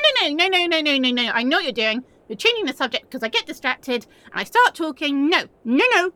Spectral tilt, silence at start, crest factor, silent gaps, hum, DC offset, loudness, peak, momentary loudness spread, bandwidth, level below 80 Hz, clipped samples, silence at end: -2.5 dB/octave; 0 s; 18 dB; none; none; under 0.1%; -20 LUFS; -2 dBFS; 10 LU; 18 kHz; -66 dBFS; under 0.1%; 0.05 s